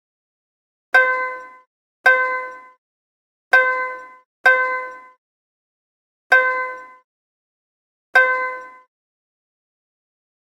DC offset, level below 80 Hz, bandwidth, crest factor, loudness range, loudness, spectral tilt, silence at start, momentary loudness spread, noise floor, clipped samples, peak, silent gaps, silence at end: under 0.1%; -80 dBFS; 16 kHz; 22 dB; 5 LU; -17 LUFS; -0.5 dB/octave; 0.95 s; 19 LU; under -90 dBFS; under 0.1%; 0 dBFS; 1.67-2.04 s, 2.78-3.51 s, 4.25-4.44 s, 5.18-6.30 s, 7.04-8.13 s; 1.75 s